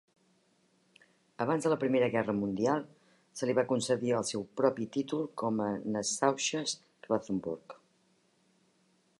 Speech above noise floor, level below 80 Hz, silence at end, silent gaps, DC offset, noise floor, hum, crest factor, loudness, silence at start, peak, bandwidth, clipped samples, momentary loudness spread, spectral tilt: 39 dB; -72 dBFS; 1.45 s; none; under 0.1%; -71 dBFS; none; 22 dB; -32 LUFS; 1.4 s; -12 dBFS; 11.5 kHz; under 0.1%; 8 LU; -4.5 dB/octave